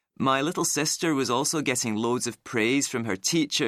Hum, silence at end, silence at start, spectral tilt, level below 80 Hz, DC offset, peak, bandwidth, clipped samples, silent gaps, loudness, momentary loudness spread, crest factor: none; 0 s; 0.2 s; -3 dB/octave; -68 dBFS; under 0.1%; -10 dBFS; 15.5 kHz; under 0.1%; none; -25 LUFS; 3 LU; 16 dB